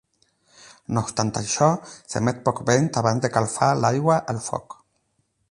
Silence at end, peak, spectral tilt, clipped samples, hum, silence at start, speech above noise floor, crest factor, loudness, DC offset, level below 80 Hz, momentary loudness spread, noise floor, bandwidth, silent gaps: 0.75 s; -2 dBFS; -5 dB/octave; under 0.1%; none; 0.9 s; 48 dB; 22 dB; -23 LUFS; under 0.1%; -56 dBFS; 10 LU; -70 dBFS; 11.5 kHz; none